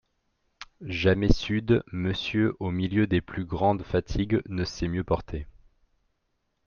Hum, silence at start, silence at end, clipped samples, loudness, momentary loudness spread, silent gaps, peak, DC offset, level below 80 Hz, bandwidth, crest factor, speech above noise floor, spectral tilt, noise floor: none; 0.6 s; 1.15 s; under 0.1%; -27 LUFS; 13 LU; none; -4 dBFS; under 0.1%; -40 dBFS; 7 kHz; 24 dB; 50 dB; -7 dB/octave; -76 dBFS